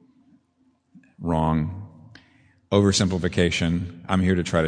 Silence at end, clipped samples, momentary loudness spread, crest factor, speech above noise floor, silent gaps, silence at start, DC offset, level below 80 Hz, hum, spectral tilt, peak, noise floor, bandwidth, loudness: 0 s; under 0.1%; 12 LU; 20 dB; 44 dB; none; 0.95 s; under 0.1%; -44 dBFS; none; -5.5 dB/octave; -4 dBFS; -65 dBFS; 10.5 kHz; -23 LUFS